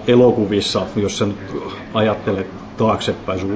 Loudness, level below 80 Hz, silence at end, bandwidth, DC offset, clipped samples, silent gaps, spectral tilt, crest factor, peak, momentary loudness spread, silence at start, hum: -19 LUFS; -42 dBFS; 0 s; 8 kHz; under 0.1%; under 0.1%; none; -5.5 dB/octave; 16 dB; -2 dBFS; 13 LU; 0 s; none